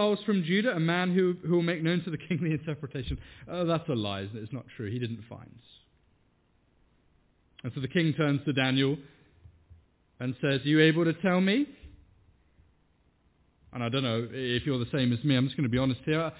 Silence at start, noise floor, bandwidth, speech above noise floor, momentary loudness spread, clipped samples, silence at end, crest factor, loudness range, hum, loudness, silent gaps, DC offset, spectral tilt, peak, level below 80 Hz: 0 s; -68 dBFS; 4 kHz; 40 dB; 13 LU; under 0.1%; 0 s; 20 dB; 9 LU; none; -29 LUFS; none; under 0.1%; -5.5 dB/octave; -10 dBFS; -54 dBFS